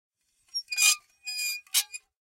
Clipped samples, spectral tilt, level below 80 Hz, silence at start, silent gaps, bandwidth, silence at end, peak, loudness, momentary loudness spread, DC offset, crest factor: under 0.1%; 7.5 dB/octave; -80 dBFS; 0.55 s; none; 16.5 kHz; 0.25 s; -8 dBFS; -26 LUFS; 14 LU; under 0.1%; 22 dB